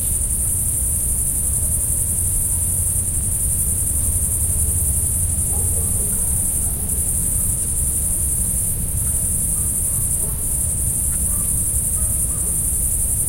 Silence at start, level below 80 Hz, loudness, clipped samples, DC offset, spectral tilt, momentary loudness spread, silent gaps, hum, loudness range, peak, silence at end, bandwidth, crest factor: 0 s; -28 dBFS; -17 LUFS; under 0.1%; under 0.1%; -3.5 dB/octave; 1 LU; none; none; 1 LU; -6 dBFS; 0 s; 16.5 kHz; 14 dB